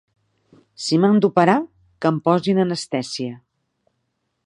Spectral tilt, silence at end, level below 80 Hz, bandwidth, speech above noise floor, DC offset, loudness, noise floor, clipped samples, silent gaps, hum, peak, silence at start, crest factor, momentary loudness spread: -6 dB/octave; 1.1 s; -66 dBFS; 11 kHz; 55 dB; under 0.1%; -19 LUFS; -73 dBFS; under 0.1%; none; none; 0 dBFS; 0.8 s; 20 dB; 13 LU